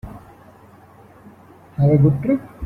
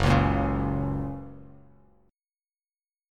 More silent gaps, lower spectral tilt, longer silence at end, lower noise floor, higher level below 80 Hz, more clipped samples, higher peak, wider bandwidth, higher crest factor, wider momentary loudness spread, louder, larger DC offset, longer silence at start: neither; first, -11.5 dB/octave vs -7.5 dB/octave; second, 0 s vs 1.6 s; second, -47 dBFS vs under -90 dBFS; second, -46 dBFS vs -38 dBFS; neither; first, -4 dBFS vs -8 dBFS; second, 2.8 kHz vs 10.5 kHz; about the same, 18 dB vs 20 dB; first, 21 LU vs 17 LU; first, -17 LUFS vs -27 LUFS; neither; about the same, 0.05 s vs 0 s